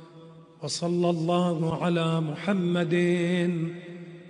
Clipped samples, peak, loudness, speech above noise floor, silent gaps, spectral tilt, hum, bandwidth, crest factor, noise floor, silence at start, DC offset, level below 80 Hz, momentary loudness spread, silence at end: under 0.1%; -12 dBFS; -26 LUFS; 23 dB; none; -6.5 dB/octave; none; 10.5 kHz; 16 dB; -49 dBFS; 0 s; under 0.1%; -66 dBFS; 9 LU; 0 s